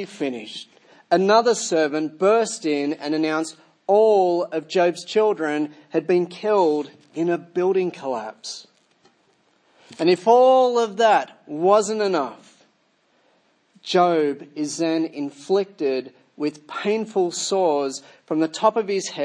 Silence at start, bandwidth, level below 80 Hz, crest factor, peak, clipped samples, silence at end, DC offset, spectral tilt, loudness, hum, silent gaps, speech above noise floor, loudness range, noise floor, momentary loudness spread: 0 s; 10.5 kHz; -80 dBFS; 18 dB; -4 dBFS; under 0.1%; 0 s; under 0.1%; -4.5 dB/octave; -21 LUFS; none; none; 43 dB; 6 LU; -64 dBFS; 12 LU